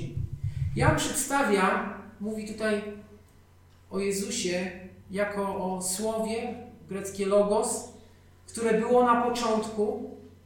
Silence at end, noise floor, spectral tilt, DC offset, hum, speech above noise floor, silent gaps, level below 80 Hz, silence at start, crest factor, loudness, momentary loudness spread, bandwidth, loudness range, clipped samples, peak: 0.15 s; -56 dBFS; -4.5 dB/octave; under 0.1%; none; 29 dB; none; -48 dBFS; 0 s; 22 dB; -28 LUFS; 14 LU; 18 kHz; 6 LU; under 0.1%; -8 dBFS